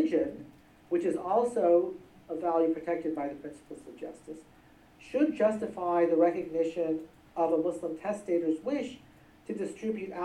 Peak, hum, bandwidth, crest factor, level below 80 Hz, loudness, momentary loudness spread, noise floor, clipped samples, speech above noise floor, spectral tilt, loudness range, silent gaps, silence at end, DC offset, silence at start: -14 dBFS; none; 11.5 kHz; 18 dB; -68 dBFS; -30 LUFS; 18 LU; -58 dBFS; under 0.1%; 28 dB; -6.5 dB/octave; 4 LU; none; 0 s; under 0.1%; 0 s